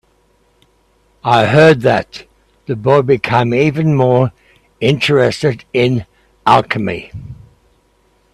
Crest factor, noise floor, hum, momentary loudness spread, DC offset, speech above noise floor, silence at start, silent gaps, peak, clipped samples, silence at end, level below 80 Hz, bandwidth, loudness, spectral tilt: 14 dB; -56 dBFS; none; 16 LU; under 0.1%; 43 dB; 1.25 s; none; 0 dBFS; under 0.1%; 1 s; -48 dBFS; 12.5 kHz; -13 LUFS; -6.5 dB/octave